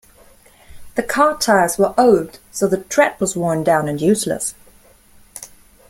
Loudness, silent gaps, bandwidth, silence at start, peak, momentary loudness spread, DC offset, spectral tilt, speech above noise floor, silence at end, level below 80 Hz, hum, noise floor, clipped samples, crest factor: -17 LUFS; none; 16.5 kHz; 0.7 s; -2 dBFS; 14 LU; under 0.1%; -4.5 dB/octave; 32 dB; 0.45 s; -50 dBFS; none; -49 dBFS; under 0.1%; 16 dB